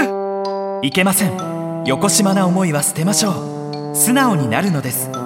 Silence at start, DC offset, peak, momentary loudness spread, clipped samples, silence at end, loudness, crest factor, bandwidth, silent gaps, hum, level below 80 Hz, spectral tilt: 0 s; under 0.1%; 0 dBFS; 9 LU; under 0.1%; 0 s; -16 LUFS; 16 dB; 17 kHz; none; none; -58 dBFS; -4 dB/octave